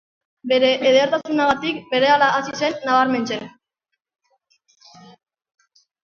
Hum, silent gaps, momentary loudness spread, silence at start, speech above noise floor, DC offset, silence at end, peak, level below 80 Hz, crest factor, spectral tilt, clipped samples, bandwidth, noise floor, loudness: none; none; 11 LU; 0.45 s; 61 dB; under 0.1%; 2.55 s; -4 dBFS; -62 dBFS; 18 dB; -4 dB/octave; under 0.1%; 7.2 kHz; -79 dBFS; -18 LUFS